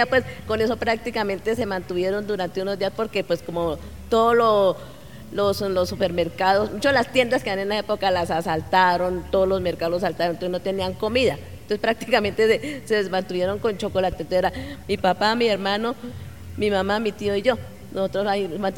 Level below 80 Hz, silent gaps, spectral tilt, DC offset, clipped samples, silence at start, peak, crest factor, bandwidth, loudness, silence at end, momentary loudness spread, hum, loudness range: -46 dBFS; none; -5 dB/octave; 0.5%; under 0.1%; 0 s; -2 dBFS; 20 dB; 17.5 kHz; -23 LUFS; 0 s; 8 LU; none; 3 LU